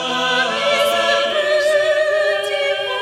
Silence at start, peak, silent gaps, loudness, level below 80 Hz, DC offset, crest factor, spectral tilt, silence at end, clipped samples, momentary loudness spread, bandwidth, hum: 0 s; -4 dBFS; none; -16 LUFS; -62 dBFS; under 0.1%; 12 dB; -1.5 dB/octave; 0 s; under 0.1%; 3 LU; 15.5 kHz; none